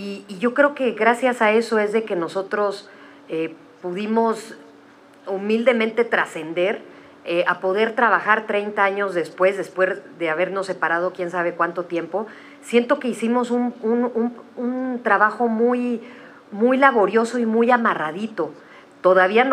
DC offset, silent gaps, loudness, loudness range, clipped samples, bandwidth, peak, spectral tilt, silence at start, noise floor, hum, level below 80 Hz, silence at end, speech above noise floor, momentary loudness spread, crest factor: under 0.1%; none; -21 LUFS; 4 LU; under 0.1%; 12 kHz; -2 dBFS; -5 dB/octave; 0 s; -48 dBFS; none; -80 dBFS; 0 s; 28 dB; 12 LU; 18 dB